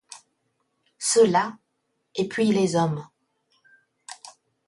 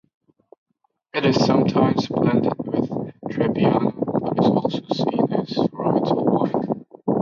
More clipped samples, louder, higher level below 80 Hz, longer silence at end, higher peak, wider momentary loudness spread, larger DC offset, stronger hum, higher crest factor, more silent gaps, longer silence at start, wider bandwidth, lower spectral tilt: neither; about the same, -23 LUFS vs -21 LUFS; second, -68 dBFS vs -56 dBFS; first, 0.4 s vs 0 s; second, -8 dBFS vs -4 dBFS; first, 24 LU vs 7 LU; neither; neither; about the same, 18 dB vs 16 dB; neither; second, 0.1 s vs 1.15 s; first, 11.5 kHz vs 7.2 kHz; second, -4.5 dB/octave vs -7.5 dB/octave